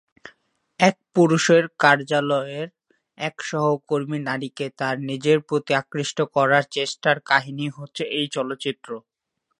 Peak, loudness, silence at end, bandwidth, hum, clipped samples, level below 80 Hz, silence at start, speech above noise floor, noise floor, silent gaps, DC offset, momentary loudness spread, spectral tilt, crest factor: 0 dBFS; -22 LUFS; 0.6 s; 11.5 kHz; none; under 0.1%; -74 dBFS; 0.25 s; 56 dB; -77 dBFS; none; under 0.1%; 13 LU; -4.5 dB/octave; 22 dB